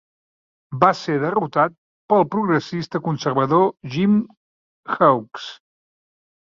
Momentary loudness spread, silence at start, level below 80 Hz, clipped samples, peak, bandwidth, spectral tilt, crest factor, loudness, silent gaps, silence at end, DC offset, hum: 14 LU; 0.7 s; -62 dBFS; under 0.1%; -2 dBFS; 7.4 kHz; -7 dB/octave; 20 dB; -20 LUFS; 1.78-2.08 s, 4.37-4.83 s; 1 s; under 0.1%; none